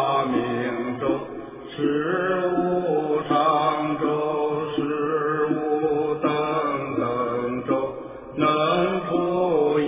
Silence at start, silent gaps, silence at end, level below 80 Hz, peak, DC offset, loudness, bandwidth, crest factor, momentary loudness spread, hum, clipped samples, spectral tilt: 0 s; none; 0 s; -58 dBFS; -8 dBFS; under 0.1%; -23 LUFS; 3.8 kHz; 16 dB; 6 LU; none; under 0.1%; -10.5 dB/octave